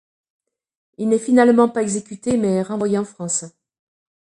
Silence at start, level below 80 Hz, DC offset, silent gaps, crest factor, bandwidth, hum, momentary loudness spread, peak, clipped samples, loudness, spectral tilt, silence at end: 1 s; -60 dBFS; under 0.1%; none; 18 dB; 11 kHz; none; 10 LU; -2 dBFS; under 0.1%; -19 LUFS; -5.5 dB/octave; 0.85 s